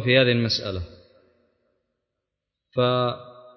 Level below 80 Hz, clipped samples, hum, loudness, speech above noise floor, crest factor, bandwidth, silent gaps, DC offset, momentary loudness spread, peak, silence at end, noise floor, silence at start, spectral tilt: -48 dBFS; under 0.1%; none; -23 LUFS; 61 dB; 20 dB; 6.4 kHz; none; under 0.1%; 18 LU; -4 dBFS; 0.25 s; -83 dBFS; 0 s; -6 dB/octave